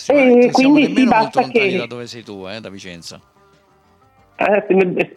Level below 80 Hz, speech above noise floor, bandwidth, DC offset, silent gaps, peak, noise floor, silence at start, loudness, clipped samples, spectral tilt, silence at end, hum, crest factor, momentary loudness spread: -58 dBFS; 39 dB; 11 kHz; under 0.1%; none; -4 dBFS; -54 dBFS; 0 s; -14 LUFS; under 0.1%; -5.5 dB/octave; 0.1 s; none; 12 dB; 21 LU